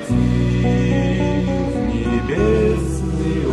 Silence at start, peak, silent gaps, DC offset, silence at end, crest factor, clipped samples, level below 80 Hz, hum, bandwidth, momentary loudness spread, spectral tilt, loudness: 0 s; -4 dBFS; none; under 0.1%; 0 s; 12 dB; under 0.1%; -26 dBFS; none; 11.5 kHz; 4 LU; -7.5 dB/octave; -18 LUFS